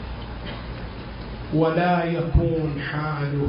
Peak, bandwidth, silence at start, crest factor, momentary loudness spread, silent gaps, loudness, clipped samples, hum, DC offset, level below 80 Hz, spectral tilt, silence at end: -8 dBFS; 5.4 kHz; 0 s; 16 dB; 15 LU; none; -24 LUFS; under 0.1%; none; under 0.1%; -34 dBFS; -12 dB/octave; 0 s